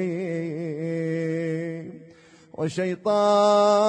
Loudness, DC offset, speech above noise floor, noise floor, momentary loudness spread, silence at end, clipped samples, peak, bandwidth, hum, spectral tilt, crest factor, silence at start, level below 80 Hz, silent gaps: -24 LUFS; under 0.1%; 31 dB; -51 dBFS; 15 LU; 0 s; under 0.1%; -10 dBFS; 9.8 kHz; none; -6 dB/octave; 14 dB; 0 s; -72 dBFS; none